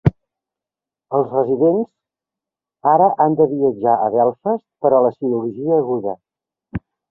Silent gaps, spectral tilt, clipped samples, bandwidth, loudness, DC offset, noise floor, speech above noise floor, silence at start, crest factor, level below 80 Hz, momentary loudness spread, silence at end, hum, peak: none; -12 dB/octave; under 0.1%; 3.6 kHz; -17 LUFS; under 0.1%; -88 dBFS; 72 dB; 0.05 s; 16 dB; -48 dBFS; 15 LU; 0.35 s; none; -2 dBFS